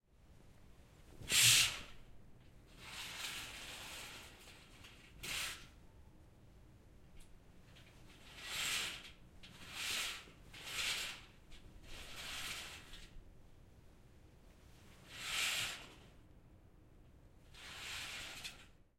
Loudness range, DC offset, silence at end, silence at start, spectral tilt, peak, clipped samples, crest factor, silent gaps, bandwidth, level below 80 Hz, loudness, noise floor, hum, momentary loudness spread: 16 LU; under 0.1%; 0.25 s; 0.2 s; 0 dB/octave; -16 dBFS; under 0.1%; 28 dB; none; 16.5 kHz; -62 dBFS; -38 LUFS; -63 dBFS; none; 24 LU